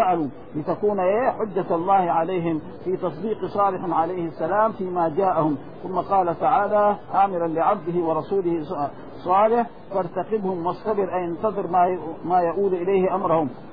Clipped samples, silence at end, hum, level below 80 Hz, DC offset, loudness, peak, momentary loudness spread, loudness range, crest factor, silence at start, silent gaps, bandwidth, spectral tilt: under 0.1%; 0 s; none; -56 dBFS; 0.7%; -23 LUFS; -6 dBFS; 8 LU; 2 LU; 16 dB; 0 s; none; 5 kHz; -11 dB/octave